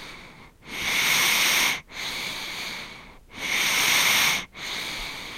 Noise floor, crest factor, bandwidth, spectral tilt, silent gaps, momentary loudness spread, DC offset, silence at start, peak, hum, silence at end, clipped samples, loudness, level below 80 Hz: -47 dBFS; 18 dB; 16 kHz; 0.5 dB/octave; none; 14 LU; under 0.1%; 0 s; -8 dBFS; none; 0 s; under 0.1%; -22 LUFS; -52 dBFS